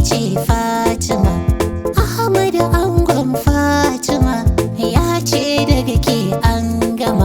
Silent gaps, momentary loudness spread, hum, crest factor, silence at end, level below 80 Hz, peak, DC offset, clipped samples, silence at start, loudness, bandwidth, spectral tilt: none; 3 LU; none; 14 dB; 0 s; -24 dBFS; 0 dBFS; under 0.1%; under 0.1%; 0 s; -15 LUFS; over 20 kHz; -5.5 dB/octave